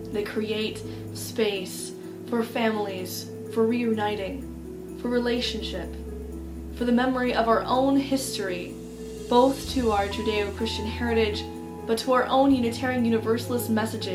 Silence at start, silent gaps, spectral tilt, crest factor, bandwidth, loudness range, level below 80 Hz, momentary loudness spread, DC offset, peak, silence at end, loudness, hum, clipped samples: 0 s; none; -5 dB/octave; 20 dB; 16 kHz; 4 LU; -44 dBFS; 15 LU; under 0.1%; -6 dBFS; 0 s; -26 LUFS; none; under 0.1%